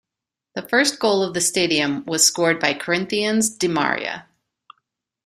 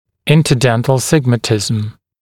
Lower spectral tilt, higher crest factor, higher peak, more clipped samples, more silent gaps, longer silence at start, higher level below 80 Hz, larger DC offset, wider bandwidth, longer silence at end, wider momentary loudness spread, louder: second, -2.5 dB/octave vs -5.5 dB/octave; first, 20 dB vs 14 dB; about the same, -2 dBFS vs 0 dBFS; neither; neither; first, 0.55 s vs 0.25 s; second, -62 dBFS vs -44 dBFS; neither; about the same, 15.5 kHz vs 16.5 kHz; first, 1.05 s vs 0.3 s; first, 10 LU vs 7 LU; second, -19 LUFS vs -14 LUFS